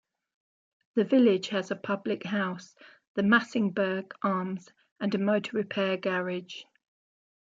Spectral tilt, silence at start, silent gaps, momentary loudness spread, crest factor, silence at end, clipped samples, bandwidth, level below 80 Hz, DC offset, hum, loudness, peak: -6.5 dB/octave; 0.95 s; 3.07-3.15 s, 4.92-4.96 s; 13 LU; 22 dB; 0.9 s; under 0.1%; 7.6 kHz; -76 dBFS; under 0.1%; none; -28 LUFS; -8 dBFS